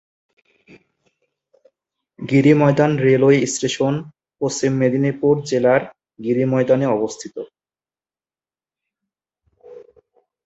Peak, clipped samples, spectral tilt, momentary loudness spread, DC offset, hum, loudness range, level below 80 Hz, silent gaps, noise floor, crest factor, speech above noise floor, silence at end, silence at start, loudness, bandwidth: -2 dBFS; under 0.1%; -6 dB/octave; 17 LU; under 0.1%; none; 6 LU; -60 dBFS; none; under -90 dBFS; 18 dB; over 73 dB; 0.65 s; 2.2 s; -17 LUFS; 8.2 kHz